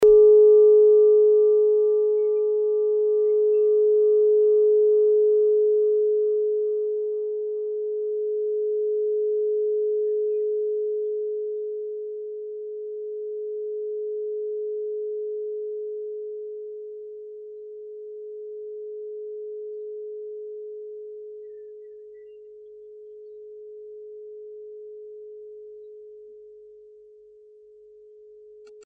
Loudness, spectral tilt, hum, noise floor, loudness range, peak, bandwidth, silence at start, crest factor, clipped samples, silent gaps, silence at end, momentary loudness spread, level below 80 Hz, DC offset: -22 LUFS; -7 dB/octave; none; -51 dBFS; 23 LU; -8 dBFS; 1.3 kHz; 0 s; 14 dB; under 0.1%; none; 0.05 s; 23 LU; -64 dBFS; under 0.1%